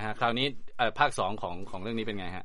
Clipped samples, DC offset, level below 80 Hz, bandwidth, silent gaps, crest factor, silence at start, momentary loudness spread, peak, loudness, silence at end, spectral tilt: under 0.1%; under 0.1%; -52 dBFS; 11.5 kHz; none; 20 dB; 0 s; 11 LU; -10 dBFS; -31 LUFS; 0 s; -4.5 dB/octave